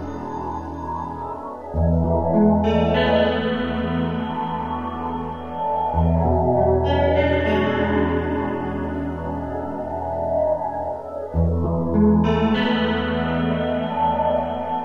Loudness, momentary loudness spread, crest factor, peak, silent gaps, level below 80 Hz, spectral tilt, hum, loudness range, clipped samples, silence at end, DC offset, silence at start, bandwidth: -22 LUFS; 11 LU; 16 dB; -6 dBFS; none; -34 dBFS; -9 dB/octave; none; 4 LU; under 0.1%; 0 s; 0.7%; 0 s; 6.6 kHz